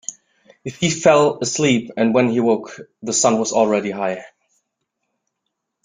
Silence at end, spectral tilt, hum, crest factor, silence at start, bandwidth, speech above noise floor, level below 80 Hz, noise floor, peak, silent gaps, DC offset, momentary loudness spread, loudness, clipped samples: 1.6 s; -4 dB/octave; none; 18 dB; 0.1 s; 9.6 kHz; 60 dB; -60 dBFS; -77 dBFS; -2 dBFS; none; under 0.1%; 18 LU; -17 LUFS; under 0.1%